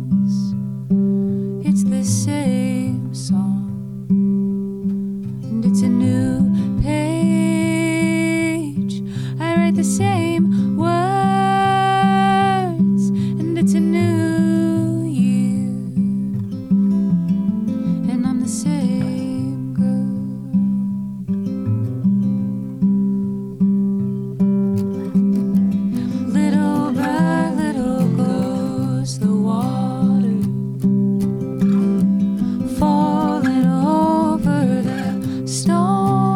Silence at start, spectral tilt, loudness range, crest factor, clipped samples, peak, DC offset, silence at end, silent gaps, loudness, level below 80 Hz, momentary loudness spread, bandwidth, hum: 0 s; -7 dB/octave; 4 LU; 12 dB; under 0.1%; -6 dBFS; under 0.1%; 0 s; none; -18 LUFS; -44 dBFS; 7 LU; 12.5 kHz; none